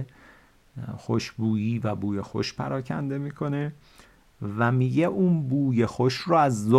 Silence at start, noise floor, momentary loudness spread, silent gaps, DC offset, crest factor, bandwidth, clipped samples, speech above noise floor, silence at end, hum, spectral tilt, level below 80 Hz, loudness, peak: 0 s; -55 dBFS; 14 LU; none; under 0.1%; 20 dB; 12.5 kHz; under 0.1%; 31 dB; 0 s; none; -7 dB/octave; -58 dBFS; -26 LUFS; -6 dBFS